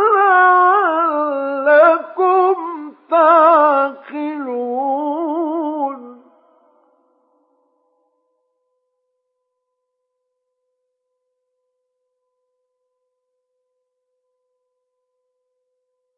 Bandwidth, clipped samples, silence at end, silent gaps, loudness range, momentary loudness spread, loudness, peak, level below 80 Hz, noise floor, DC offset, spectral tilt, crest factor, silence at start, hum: 5 kHz; under 0.1%; 10.05 s; none; 13 LU; 14 LU; -14 LUFS; -2 dBFS; under -90 dBFS; -75 dBFS; under 0.1%; -6.5 dB/octave; 16 dB; 0 s; none